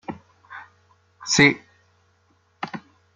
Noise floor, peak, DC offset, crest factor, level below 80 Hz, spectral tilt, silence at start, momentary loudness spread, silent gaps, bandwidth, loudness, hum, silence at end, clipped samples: -63 dBFS; -2 dBFS; under 0.1%; 26 dB; -60 dBFS; -3.5 dB/octave; 0.1 s; 26 LU; none; 9.6 kHz; -19 LUFS; none; 0.35 s; under 0.1%